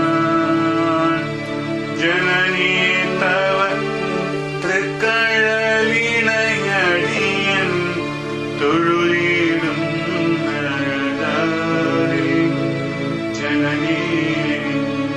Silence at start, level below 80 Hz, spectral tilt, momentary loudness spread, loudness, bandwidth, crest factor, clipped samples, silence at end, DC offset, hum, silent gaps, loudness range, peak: 0 s; -52 dBFS; -5 dB/octave; 7 LU; -17 LUFS; 10.5 kHz; 14 dB; under 0.1%; 0 s; under 0.1%; none; none; 3 LU; -4 dBFS